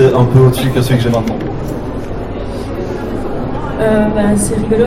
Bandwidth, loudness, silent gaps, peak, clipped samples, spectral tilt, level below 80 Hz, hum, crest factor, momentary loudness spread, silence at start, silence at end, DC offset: 15.5 kHz; -14 LUFS; none; 0 dBFS; under 0.1%; -6.5 dB/octave; -28 dBFS; none; 12 dB; 13 LU; 0 s; 0 s; under 0.1%